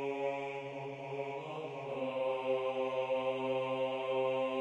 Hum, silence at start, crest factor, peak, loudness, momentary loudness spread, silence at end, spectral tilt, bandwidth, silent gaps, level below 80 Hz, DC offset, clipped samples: none; 0 s; 14 dB; -22 dBFS; -37 LUFS; 8 LU; 0 s; -6 dB/octave; 8.4 kHz; none; -78 dBFS; under 0.1%; under 0.1%